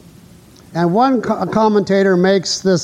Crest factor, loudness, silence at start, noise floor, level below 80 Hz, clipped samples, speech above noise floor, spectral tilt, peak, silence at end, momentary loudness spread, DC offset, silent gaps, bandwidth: 12 dB; -15 LUFS; 0.7 s; -43 dBFS; -54 dBFS; under 0.1%; 29 dB; -5.5 dB/octave; -2 dBFS; 0 s; 5 LU; under 0.1%; none; 12 kHz